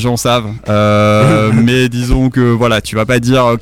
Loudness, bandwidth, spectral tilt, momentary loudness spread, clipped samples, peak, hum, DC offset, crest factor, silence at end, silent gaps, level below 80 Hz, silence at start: -11 LUFS; 16 kHz; -6 dB/octave; 5 LU; under 0.1%; -2 dBFS; none; under 0.1%; 8 dB; 0 s; none; -26 dBFS; 0 s